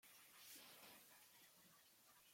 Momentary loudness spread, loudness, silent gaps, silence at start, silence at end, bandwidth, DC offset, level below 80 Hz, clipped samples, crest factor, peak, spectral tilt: 9 LU; -64 LUFS; none; 0 s; 0 s; 16.5 kHz; under 0.1%; under -90 dBFS; under 0.1%; 18 dB; -48 dBFS; -0.5 dB/octave